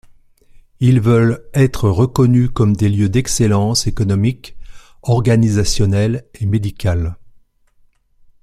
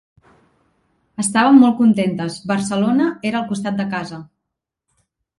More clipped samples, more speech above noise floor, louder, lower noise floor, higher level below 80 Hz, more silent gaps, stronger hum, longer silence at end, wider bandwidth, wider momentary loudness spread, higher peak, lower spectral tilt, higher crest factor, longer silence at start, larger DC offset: neither; second, 39 dB vs 64 dB; about the same, -15 LUFS vs -17 LUFS; second, -53 dBFS vs -80 dBFS; first, -34 dBFS vs -60 dBFS; neither; neither; about the same, 1.2 s vs 1.15 s; first, 14 kHz vs 11.5 kHz; second, 7 LU vs 15 LU; about the same, -2 dBFS vs 0 dBFS; about the same, -6 dB/octave vs -5 dB/octave; about the same, 14 dB vs 18 dB; second, 0.8 s vs 1.2 s; neither